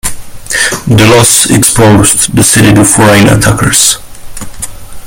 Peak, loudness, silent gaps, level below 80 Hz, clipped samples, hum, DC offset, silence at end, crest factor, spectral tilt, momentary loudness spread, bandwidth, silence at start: 0 dBFS; -5 LUFS; none; -26 dBFS; 4%; none; under 0.1%; 0 s; 6 dB; -3.5 dB/octave; 17 LU; over 20 kHz; 0.05 s